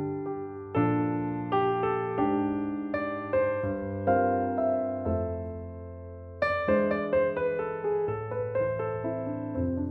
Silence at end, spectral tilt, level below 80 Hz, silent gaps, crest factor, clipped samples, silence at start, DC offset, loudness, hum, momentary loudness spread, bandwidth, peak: 0 s; -10 dB/octave; -52 dBFS; none; 16 dB; under 0.1%; 0 s; under 0.1%; -29 LUFS; none; 9 LU; 5.8 kHz; -12 dBFS